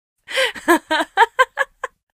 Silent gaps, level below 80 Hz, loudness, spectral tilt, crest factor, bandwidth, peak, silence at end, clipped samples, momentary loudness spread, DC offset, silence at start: none; -58 dBFS; -18 LUFS; -1 dB/octave; 20 dB; 15.5 kHz; 0 dBFS; 0.3 s; under 0.1%; 9 LU; under 0.1%; 0.3 s